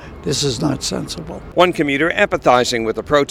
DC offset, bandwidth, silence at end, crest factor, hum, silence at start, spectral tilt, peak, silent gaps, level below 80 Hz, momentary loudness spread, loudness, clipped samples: under 0.1%; 16 kHz; 0 s; 16 dB; none; 0 s; -4 dB/octave; 0 dBFS; none; -40 dBFS; 9 LU; -17 LUFS; under 0.1%